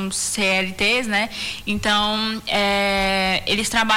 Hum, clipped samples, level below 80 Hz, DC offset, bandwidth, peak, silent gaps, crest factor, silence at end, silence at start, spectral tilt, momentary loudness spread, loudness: none; under 0.1%; -42 dBFS; under 0.1%; 16.5 kHz; -8 dBFS; none; 12 dB; 0 s; 0 s; -2.5 dB/octave; 5 LU; -19 LUFS